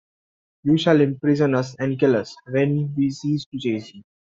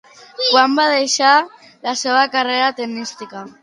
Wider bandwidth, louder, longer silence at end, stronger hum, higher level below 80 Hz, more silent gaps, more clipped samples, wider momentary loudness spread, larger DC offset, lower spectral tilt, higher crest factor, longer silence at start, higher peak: second, 7.6 kHz vs 11.5 kHz; second, -21 LUFS vs -15 LUFS; first, 0.3 s vs 0.1 s; neither; first, -60 dBFS vs -74 dBFS; first, 3.46-3.52 s vs none; neither; second, 9 LU vs 16 LU; neither; first, -7.5 dB/octave vs -1 dB/octave; about the same, 18 dB vs 18 dB; first, 0.65 s vs 0.4 s; about the same, -2 dBFS vs 0 dBFS